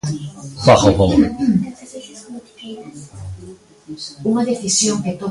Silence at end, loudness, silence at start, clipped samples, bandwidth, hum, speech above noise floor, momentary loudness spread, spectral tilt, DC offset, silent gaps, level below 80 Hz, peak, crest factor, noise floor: 0 s; -16 LUFS; 0.05 s; under 0.1%; 11.5 kHz; none; 24 dB; 23 LU; -5 dB/octave; under 0.1%; none; -38 dBFS; 0 dBFS; 18 dB; -40 dBFS